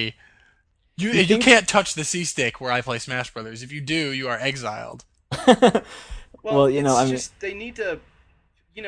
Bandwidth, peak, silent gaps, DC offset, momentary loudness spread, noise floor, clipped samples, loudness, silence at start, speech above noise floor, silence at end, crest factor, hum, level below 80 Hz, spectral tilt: 10.5 kHz; 0 dBFS; none; under 0.1%; 19 LU; -63 dBFS; under 0.1%; -20 LUFS; 0 s; 42 dB; 0 s; 22 dB; none; -50 dBFS; -4 dB/octave